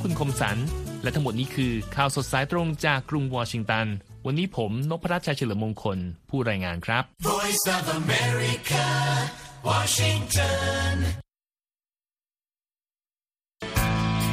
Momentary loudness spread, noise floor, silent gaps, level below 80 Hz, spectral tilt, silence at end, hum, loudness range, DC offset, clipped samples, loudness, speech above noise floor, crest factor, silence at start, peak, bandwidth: 7 LU; under -90 dBFS; none; -42 dBFS; -4.5 dB/octave; 0 s; none; 5 LU; under 0.1%; under 0.1%; -26 LUFS; over 64 dB; 20 dB; 0 s; -6 dBFS; 15.5 kHz